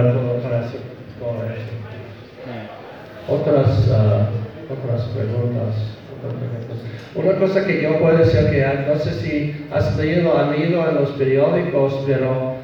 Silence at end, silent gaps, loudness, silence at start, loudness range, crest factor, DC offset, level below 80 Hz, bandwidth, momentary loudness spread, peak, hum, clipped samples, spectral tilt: 0 s; none; -19 LUFS; 0 s; 6 LU; 16 dB; under 0.1%; -44 dBFS; 6.6 kHz; 17 LU; -4 dBFS; none; under 0.1%; -9 dB/octave